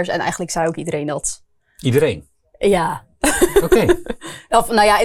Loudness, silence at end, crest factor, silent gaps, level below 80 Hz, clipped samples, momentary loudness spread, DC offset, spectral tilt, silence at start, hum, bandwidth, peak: -18 LUFS; 0 s; 16 dB; none; -36 dBFS; under 0.1%; 11 LU; under 0.1%; -4.5 dB/octave; 0 s; none; 19 kHz; 0 dBFS